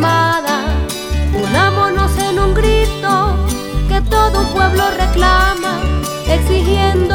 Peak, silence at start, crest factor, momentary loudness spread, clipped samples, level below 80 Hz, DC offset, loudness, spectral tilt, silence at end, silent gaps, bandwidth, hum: 0 dBFS; 0 s; 12 dB; 6 LU; under 0.1%; -18 dBFS; under 0.1%; -14 LUFS; -5 dB/octave; 0 s; none; 19 kHz; none